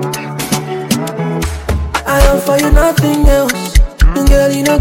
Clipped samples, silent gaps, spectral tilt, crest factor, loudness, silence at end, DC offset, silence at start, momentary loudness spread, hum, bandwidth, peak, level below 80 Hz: under 0.1%; none; -5 dB/octave; 10 dB; -13 LUFS; 0 s; under 0.1%; 0 s; 7 LU; none; 17 kHz; 0 dBFS; -14 dBFS